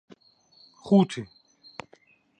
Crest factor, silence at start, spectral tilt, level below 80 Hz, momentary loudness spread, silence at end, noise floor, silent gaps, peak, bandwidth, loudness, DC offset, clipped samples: 20 dB; 0.85 s; -7.5 dB/octave; -70 dBFS; 24 LU; 1.15 s; -60 dBFS; none; -8 dBFS; 9.6 kHz; -24 LUFS; under 0.1%; under 0.1%